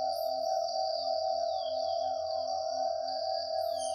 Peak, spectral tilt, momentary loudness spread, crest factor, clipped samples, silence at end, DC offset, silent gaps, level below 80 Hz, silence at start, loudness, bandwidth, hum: -20 dBFS; -1.5 dB/octave; 2 LU; 12 dB; under 0.1%; 0 s; under 0.1%; none; -74 dBFS; 0 s; -33 LUFS; 14 kHz; none